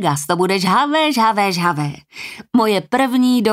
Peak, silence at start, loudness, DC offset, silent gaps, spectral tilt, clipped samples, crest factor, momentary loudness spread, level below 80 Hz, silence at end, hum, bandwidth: -4 dBFS; 0 s; -16 LUFS; under 0.1%; none; -5 dB/octave; under 0.1%; 14 dB; 11 LU; -60 dBFS; 0 s; none; 16 kHz